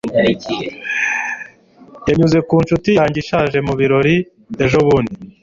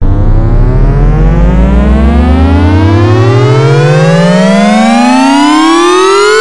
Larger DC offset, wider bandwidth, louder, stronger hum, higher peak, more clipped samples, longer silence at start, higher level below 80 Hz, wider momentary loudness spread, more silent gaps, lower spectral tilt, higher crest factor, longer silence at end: second, under 0.1% vs 4%; second, 7.6 kHz vs 11.5 kHz; second, -16 LUFS vs -6 LUFS; neither; about the same, -2 dBFS vs 0 dBFS; second, under 0.1% vs 0.9%; about the same, 0.05 s vs 0 s; second, -42 dBFS vs -10 dBFS; first, 11 LU vs 4 LU; neither; about the same, -6.5 dB/octave vs -6.5 dB/octave; first, 14 dB vs 4 dB; about the same, 0.1 s vs 0 s